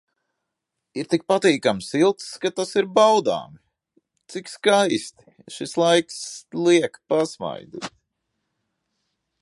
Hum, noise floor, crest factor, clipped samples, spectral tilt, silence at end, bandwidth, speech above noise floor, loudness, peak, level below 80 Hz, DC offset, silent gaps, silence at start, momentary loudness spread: none; -81 dBFS; 20 dB; under 0.1%; -4 dB/octave; 1.55 s; 11.5 kHz; 60 dB; -21 LUFS; -4 dBFS; -68 dBFS; under 0.1%; none; 0.95 s; 18 LU